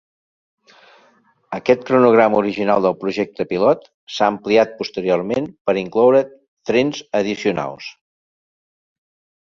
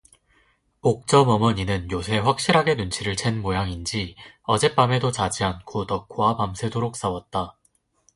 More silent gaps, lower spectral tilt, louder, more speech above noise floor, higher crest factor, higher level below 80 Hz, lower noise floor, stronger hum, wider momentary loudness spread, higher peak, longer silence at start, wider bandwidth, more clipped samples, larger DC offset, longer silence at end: first, 3.94-4.07 s, 5.61-5.65 s, 6.48-6.57 s vs none; about the same, -6 dB/octave vs -5 dB/octave; first, -18 LUFS vs -23 LUFS; about the same, 39 dB vs 41 dB; about the same, 18 dB vs 20 dB; second, -60 dBFS vs -44 dBFS; second, -56 dBFS vs -63 dBFS; neither; first, 13 LU vs 10 LU; about the same, -2 dBFS vs -4 dBFS; first, 1.5 s vs 0.85 s; second, 7.4 kHz vs 11.5 kHz; neither; neither; first, 1.55 s vs 0.65 s